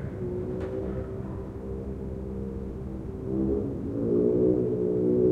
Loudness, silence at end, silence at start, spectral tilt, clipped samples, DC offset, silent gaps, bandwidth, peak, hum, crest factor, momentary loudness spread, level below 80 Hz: -29 LUFS; 0 s; 0 s; -11 dB/octave; under 0.1%; under 0.1%; none; 4.3 kHz; -12 dBFS; none; 16 dB; 12 LU; -42 dBFS